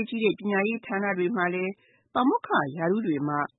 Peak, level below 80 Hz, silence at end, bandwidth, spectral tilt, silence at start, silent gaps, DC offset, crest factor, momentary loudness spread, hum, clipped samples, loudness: -10 dBFS; -74 dBFS; 0.1 s; 4.1 kHz; -10.5 dB/octave; 0 s; none; under 0.1%; 16 dB; 4 LU; none; under 0.1%; -27 LUFS